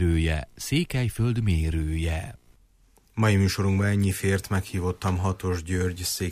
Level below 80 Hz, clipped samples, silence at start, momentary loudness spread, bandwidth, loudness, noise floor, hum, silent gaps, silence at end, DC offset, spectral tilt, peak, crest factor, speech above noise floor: -36 dBFS; under 0.1%; 0 s; 7 LU; 15.5 kHz; -26 LUFS; -60 dBFS; none; none; 0 s; under 0.1%; -5.5 dB/octave; -12 dBFS; 14 dB; 35 dB